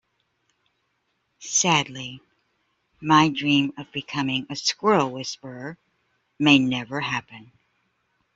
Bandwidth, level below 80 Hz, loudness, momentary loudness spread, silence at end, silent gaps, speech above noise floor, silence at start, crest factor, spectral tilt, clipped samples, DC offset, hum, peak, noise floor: 8 kHz; -64 dBFS; -22 LUFS; 18 LU; 0.95 s; none; 50 dB; 1.4 s; 22 dB; -3.5 dB/octave; under 0.1%; under 0.1%; none; -4 dBFS; -73 dBFS